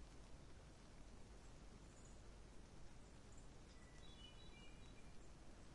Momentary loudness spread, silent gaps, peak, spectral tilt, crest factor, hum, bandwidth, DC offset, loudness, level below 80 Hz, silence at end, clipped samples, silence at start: 3 LU; none; -46 dBFS; -4.5 dB/octave; 12 dB; none; 11 kHz; under 0.1%; -64 LUFS; -64 dBFS; 0 s; under 0.1%; 0 s